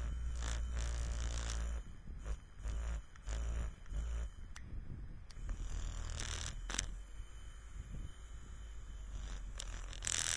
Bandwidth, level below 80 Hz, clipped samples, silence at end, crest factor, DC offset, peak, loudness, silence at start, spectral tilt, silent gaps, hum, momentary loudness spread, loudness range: 11 kHz; -44 dBFS; under 0.1%; 0 s; 28 dB; under 0.1%; -14 dBFS; -45 LUFS; 0 s; -2.5 dB/octave; none; none; 12 LU; 4 LU